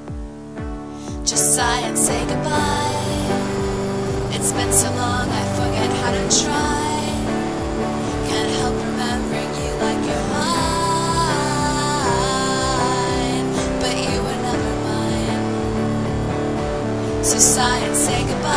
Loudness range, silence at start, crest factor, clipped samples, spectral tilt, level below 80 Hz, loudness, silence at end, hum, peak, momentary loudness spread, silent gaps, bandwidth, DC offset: 3 LU; 0 s; 20 dB; under 0.1%; -3.5 dB/octave; -34 dBFS; -19 LUFS; 0 s; none; 0 dBFS; 7 LU; none; 11 kHz; 0.6%